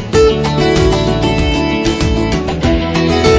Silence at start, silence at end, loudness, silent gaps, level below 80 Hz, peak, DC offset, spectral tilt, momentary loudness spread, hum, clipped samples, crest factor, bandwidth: 0 s; 0 s; -13 LUFS; none; -20 dBFS; 0 dBFS; under 0.1%; -6 dB/octave; 3 LU; none; under 0.1%; 12 dB; 8 kHz